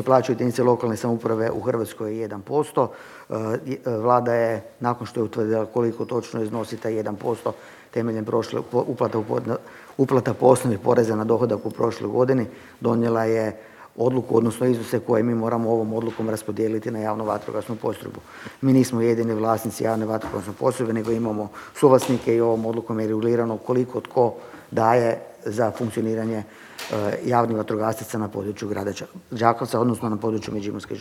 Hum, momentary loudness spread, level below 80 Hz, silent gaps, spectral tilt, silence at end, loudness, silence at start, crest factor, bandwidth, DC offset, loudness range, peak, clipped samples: none; 10 LU; -62 dBFS; none; -7 dB/octave; 0 s; -23 LUFS; 0 s; 22 dB; 16.5 kHz; under 0.1%; 4 LU; -2 dBFS; under 0.1%